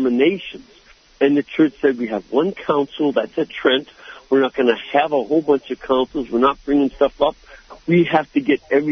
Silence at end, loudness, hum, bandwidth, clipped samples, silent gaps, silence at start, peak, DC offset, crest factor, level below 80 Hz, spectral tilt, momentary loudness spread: 0 s; -19 LUFS; none; 6.4 kHz; under 0.1%; none; 0 s; -2 dBFS; under 0.1%; 16 dB; -52 dBFS; -7 dB/octave; 5 LU